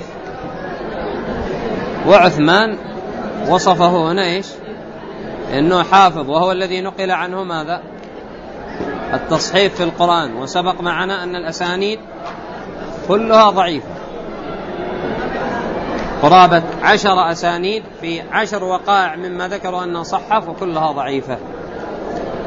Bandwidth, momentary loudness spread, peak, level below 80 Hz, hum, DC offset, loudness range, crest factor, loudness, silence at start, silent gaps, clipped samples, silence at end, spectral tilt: 8 kHz; 18 LU; 0 dBFS; -42 dBFS; none; under 0.1%; 5 LU; 16 dB; -16 LUFS; 0 s; none; under 0.1%; 0 s; -5 dB/octave